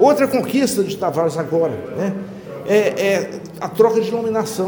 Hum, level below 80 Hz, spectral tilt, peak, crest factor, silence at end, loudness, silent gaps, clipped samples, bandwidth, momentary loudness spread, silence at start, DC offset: none; -60 dBFS; -5.5 dB/octave; -2 dBFS; 16 dB; 0 s; -19 LUFS; none; under 0.1%; over 20 kHz; 13 LU; 0 s; under 0.1%